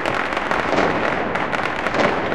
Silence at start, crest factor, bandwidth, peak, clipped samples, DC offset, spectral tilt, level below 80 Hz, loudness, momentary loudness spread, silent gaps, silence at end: 0 s; 18 dB; 15.5 kHz; -2 dBFS; under 0.1%; 2%; -5 dB/octave; -44 dBFS; -20 LUFS; 3 LU; none; 0 s